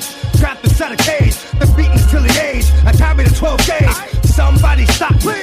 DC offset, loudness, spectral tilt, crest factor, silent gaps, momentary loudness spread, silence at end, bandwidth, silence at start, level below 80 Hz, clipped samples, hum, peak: under 0.1%; -13 LUFS; -5 dB/octave; 10 dB; none; 4 LU; 0 s; 15.5 kHz; 0 s; -14 dBFS; under 0.1%; none; -2 dBFS